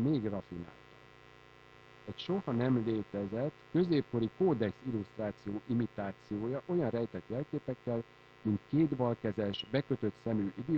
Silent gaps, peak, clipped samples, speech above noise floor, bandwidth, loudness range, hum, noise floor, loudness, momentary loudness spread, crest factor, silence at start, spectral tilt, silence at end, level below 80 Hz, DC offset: none; -18 dBFS; under 0.1%; 24 dB; 7.2 kHz; 4 LU; 60 Hz at -55 dBFS; -58 dBFS; -35 LUFS; 10 LU; 18 dB; 0 s; -9 dB/octave; 0 s; -66 dBFS; under 0.1%